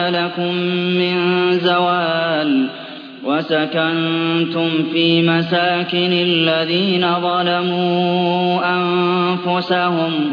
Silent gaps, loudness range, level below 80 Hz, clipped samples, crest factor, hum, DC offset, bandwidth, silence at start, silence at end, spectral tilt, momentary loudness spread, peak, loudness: none; 2 LU; -68 dBFS; under 0.1%; 14 dB; none; under 0.1%; 5.4 kHz; 0 s; 0 s; -8 dB/octave; 4 LU; -4 dBFS; -16 LUFS